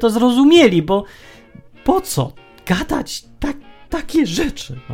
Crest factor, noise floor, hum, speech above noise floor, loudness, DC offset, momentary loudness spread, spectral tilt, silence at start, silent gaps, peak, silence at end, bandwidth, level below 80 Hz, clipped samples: 16 dB; -42 dBFS; none; 26 dB; -17 LUFS; under 0.1%; 17 LU; -5 dB/octave; 0 s; none; 0 dBFS; 0 s; 16.5 kHz; -36 dBFS; under 0.1%